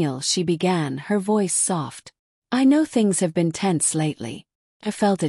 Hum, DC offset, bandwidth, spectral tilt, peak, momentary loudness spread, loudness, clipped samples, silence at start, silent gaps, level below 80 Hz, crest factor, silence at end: none; under 0.1%; 13.5 kHz; -4.5 dB/octave; -8 dBFS; 14 LU; -21 LUFS; under 0.1%; 0 s; 2.19-2.42 s, 4.55-4.80 s; -66 dBFS; 14 dB; 0 s